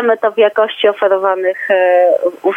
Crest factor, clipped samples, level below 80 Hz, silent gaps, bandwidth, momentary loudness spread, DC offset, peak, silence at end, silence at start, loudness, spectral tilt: 12 dB; under 0.1%; -74 dBFS; none; 3.8 kHz; 4 LU; under 0.1%; 0 dBFS; 0 s; 0 s; -13 LUFS; -5 dB/octave